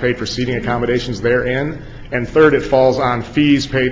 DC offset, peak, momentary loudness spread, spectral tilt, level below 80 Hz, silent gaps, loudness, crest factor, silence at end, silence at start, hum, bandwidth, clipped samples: under 0.1%; 0 dBFS; 10 LU; -6 dB/octave; -36 dBFS; none; -16 LUFS; 16 dB; 0 s; 0 s; none; 7.8 kHz; under 0.1%